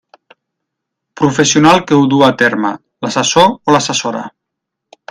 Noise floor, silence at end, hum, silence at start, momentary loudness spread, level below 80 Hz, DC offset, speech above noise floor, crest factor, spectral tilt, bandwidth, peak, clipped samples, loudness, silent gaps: -77 dBFS; 0.8 s; none; 1.2 s; 12 LU; -52 dBFS; under 0.1%; 66 dB; 14 dB; -4 dB/octave; 12.5 kHz; 0 dBFS; 0.1%; -11 LUFS; none